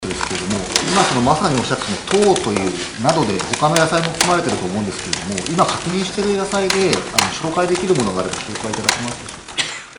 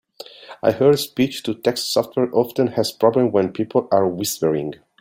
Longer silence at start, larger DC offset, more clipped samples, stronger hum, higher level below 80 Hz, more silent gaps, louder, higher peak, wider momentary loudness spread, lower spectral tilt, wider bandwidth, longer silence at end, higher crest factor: second, 0 s vs 0.2 s; first, 0.1% vs under 0.1%; neither; neither; first, -44 dBFS vs -60 dBFS; neither; about the same, -18 LUFS vs -20 LUFS; about the same, 0 dBFS vs -2 dBFS; about the same, 7 LU vs 7 LU; second, -3.5 dB/octave vs -5 dB/octave; second, 14.5 kHz vs 16.5 kHz; second, 0.05 s vs 0.25 s; about the same, 18 dB vs 18 dB